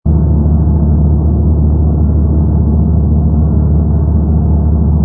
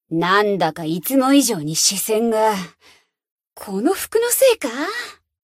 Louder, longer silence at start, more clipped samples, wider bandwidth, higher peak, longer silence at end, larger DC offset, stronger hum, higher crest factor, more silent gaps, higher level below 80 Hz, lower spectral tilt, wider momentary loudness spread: first, -11 LUFS vs -18 LUFS; about the same, 0.05 s vs 0.1 s; neither; second, 1.5 kHz vs 16 kHz; about the same, 0 dBFS vs -2 dBFS; second, 0 s vs 0.3 s; neither; neither; second, 10 dB vs 18 dB; second, none vs 3.31-3.36 s; first, -12 dBFS vs -62 dBFS; first, -16 dB/octave vs -3 dB/octave; second, 1 LU vs 13 LU